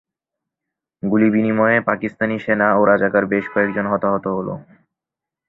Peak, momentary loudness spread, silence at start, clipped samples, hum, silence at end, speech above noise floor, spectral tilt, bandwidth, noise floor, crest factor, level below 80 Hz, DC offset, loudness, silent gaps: 0 dBFS; 9 LU; 1.05 s; under 0.1%; none; 0.85 s; 69 dB; -10 dB/octave; 4.1 kHz; -86 dBFS; 18 dB; -56 dBFS; under 0.1%; -18 LUFS; none